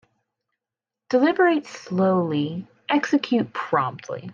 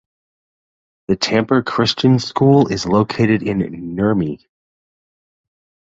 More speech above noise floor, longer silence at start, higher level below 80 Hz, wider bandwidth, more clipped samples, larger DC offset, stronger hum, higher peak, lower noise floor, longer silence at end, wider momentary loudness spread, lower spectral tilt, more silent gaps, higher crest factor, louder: second, 66 dB vs over 74 dB; about the same, 1.1 s vs 1.1 s; second, -74 dBFS vs -48 dBFS; about the same, 7.4 kHz vs 7.8 kHz; neither; neither; neither; second, -8 dBFS vs -2 dBFS; about the same, -88 dBFS vs under -90 dBFS; second, 0 s vs 1.55 s; about the same, 10 LU vs 10 LU; about the same, -6.5 dB/octave vs -6 dB/octave; neither; about the same, 16 dB vs 16 dB; second, -22 LUFS vs -16 LUFS